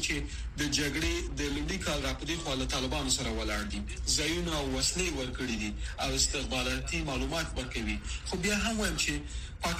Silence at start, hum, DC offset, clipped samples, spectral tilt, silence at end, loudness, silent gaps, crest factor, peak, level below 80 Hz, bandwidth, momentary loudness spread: 0 s; none; under 0.1%; under 0.1%; -3 dB/octave; 0 s; -32 LUFS; none; 18 dB; -14 dBFS; -38 dBFS; 15.5 kHz; 7 LU